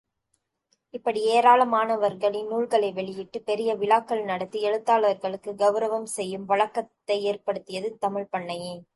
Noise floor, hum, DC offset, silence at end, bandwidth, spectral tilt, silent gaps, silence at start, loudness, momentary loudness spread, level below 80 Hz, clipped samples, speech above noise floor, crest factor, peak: -76 dBFS; none; under 0.1%; 0.15 s; 11.5 kHz; -4 dB/octave; none; 0.95 s; -25 LUFS; 12 LU; -76 dBFS; under 0.1%; 51 dB; 20 dB; -6 dBFS